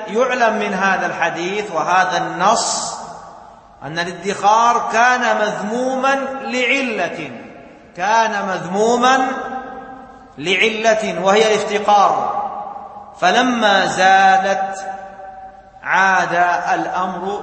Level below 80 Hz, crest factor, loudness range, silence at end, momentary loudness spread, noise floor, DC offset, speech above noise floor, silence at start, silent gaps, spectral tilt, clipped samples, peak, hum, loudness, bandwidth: -56 dBFS; 18 dB; 4 LU; 0 s; 17 LU; -41 dBFS; under 0.1%; 25 dB; 0 s; none; -3 dB/octave; under 0.1%; 0 dBFS; none; -16 LUFS; 8.8 kHz